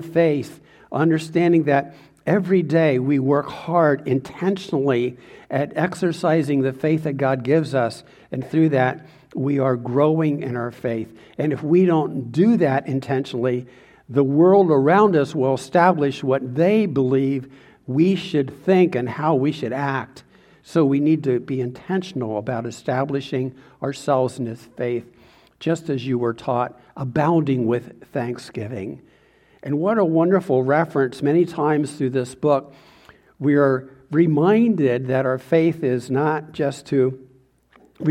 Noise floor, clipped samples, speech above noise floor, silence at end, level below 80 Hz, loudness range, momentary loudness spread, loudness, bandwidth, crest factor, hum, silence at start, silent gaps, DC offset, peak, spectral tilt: -55 dBFS; under 0.1%; 36 dB; 0 s; -62 dBFS; 6 LU; 11 LU; -20 LUFS; 12.5 kHz; 20 dB; none; 0 s; none; under 0.1%; -2 dBFS; -8 dB/octave